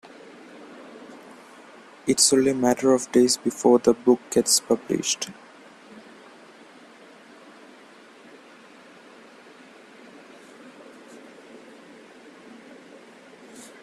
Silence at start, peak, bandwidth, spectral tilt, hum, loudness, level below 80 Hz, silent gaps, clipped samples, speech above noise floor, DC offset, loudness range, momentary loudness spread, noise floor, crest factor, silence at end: 0.95 s; -4 dBFS; 15 kHz; -3 dB/octave; none; -21 LUFS; -66 dBFS; none; under 0.1%; 29 dB; under 0.1%; 11 LU; 28 LU; -49 dBFS; 22 dB; 0.2 s